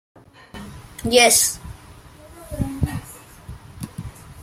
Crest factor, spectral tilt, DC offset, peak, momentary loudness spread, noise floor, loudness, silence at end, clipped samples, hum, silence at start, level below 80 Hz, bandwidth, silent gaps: 22 dB; -2.5 dB/octave; under 0.1%; -2 dBFS; 28 LU; -44 dBFS; -18 LUFS; 0 s; under 0.1%; none; 0.55 s; -42 dBFS; 16.5 kHz; none